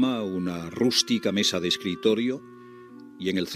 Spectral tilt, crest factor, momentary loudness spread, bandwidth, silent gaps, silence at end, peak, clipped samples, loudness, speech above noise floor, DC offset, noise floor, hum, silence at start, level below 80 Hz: -4 dB/octave; 20 dB; 10 LU; 15.5 kHz; none; 0 s; -6 dBFS; under 0.1%; -25 LUFS; 20 dB; under 0.1%; -46 dBFS; none; 0 s; -68 dBFS